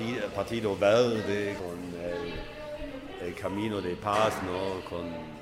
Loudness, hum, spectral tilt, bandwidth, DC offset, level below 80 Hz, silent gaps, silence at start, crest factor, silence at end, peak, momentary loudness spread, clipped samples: -31 LUFS; none; -5.5 dB/octave; 16 kHz; under 0.1%; -52 dBFS; none; 0 s; 18 dB; 0 s; -12 dBFS; 15 LU; under 0.1%